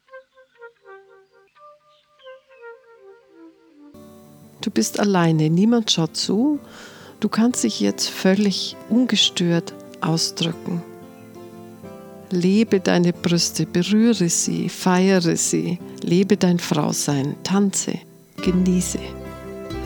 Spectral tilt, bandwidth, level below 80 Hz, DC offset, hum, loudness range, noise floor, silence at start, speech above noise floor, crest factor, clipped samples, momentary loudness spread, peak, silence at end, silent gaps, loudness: -4.5 dB/octave; 19.5 kHz; -50 dBFS; under 0.1%; none; 5 LU; -56 dBFS; 0.15 s; 37 dB; 18 dB; under 0.1%; 20 LU; -4 dBFS; 0 s; none; -20 LUFS